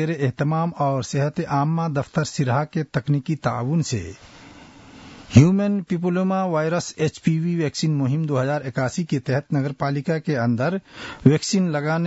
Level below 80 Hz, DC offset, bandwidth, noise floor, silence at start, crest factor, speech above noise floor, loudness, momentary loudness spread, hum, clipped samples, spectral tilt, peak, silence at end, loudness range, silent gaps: -54 dBFS; under 0.1%; 8 kHz; -45 dBFS; 0 s; 20 dB; 23 dB; -22 LUFS; 7 LU; none; under 0.1%; -6.5 dB/octave; -2 dBFS; 0 s; 3 LU; none